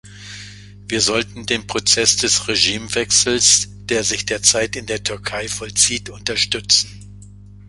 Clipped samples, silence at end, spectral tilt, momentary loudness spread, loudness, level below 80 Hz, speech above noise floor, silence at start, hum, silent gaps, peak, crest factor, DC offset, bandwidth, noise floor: under 0.1%; 0 s; -1 dB/octave; 12 LU; -16 LUFS; -44 dBFS; 21 dB; 0.05 s; 50 Hz at -35 dBFS; none; 0 dBFS; 20 dB; under 0.1%; 13 kHz; -40 dBFS